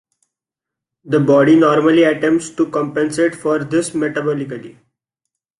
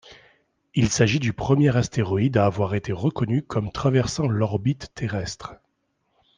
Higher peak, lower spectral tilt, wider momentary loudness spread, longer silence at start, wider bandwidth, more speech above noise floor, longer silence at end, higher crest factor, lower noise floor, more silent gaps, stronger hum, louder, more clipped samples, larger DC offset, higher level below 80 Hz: about the same, -2 dBFS vs -4 dBFS; about the same, -6 dB/octave vs -6 dB/octave; about the same, 10 LU vs 9 LU; first, 1.05 s vs 0.05 s; first, 11.5 kHz vs 9.8 kHz; first, 70 dB vs 50 dB; about the same, 0.9 s vs 0.85 s; about the same, 14 dB vs 18 dB; first, -85 dBFS vs -72 dBFS; neither; neither; first, -15 LUFS vs -23 LUFS; neither; neither; second, -60 dBFS vs -48 dBFS